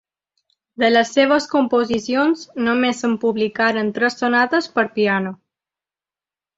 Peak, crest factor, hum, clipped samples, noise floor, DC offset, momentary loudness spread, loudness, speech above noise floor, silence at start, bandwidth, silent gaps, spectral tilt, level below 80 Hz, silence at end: -2 dBFS; 18 dB; none; under 0.1%; under -90 dBFS; under 0.1%; 5 LU; -18 LUFS; over 72 dB; 0.8 s; 8 kHz; none; -4.5 dB/octave; -62 dBFS; 1.25 s